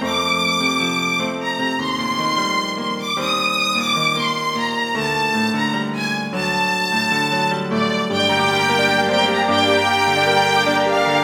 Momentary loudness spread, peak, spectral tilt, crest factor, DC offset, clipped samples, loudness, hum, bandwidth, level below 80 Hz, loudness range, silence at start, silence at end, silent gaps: 6 LU; -4 dBFS; -3.5 dB/octave; 16 dB; under 0.1%; under 0.1%; -18 LUFS; none; over 20 kHz; -60 dBFS; 3 LU; 0 s; 0 s; none